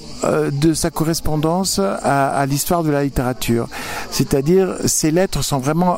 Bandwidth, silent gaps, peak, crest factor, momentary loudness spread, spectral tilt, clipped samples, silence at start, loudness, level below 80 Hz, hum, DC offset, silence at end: 16.5 kHz; none; -2 dBFS; 16 dB; 5 LU; -5 dB/octave; under 0.1%; 0 s; -18 LUFS; -34 dBFS; none; under 0.1%; 0 s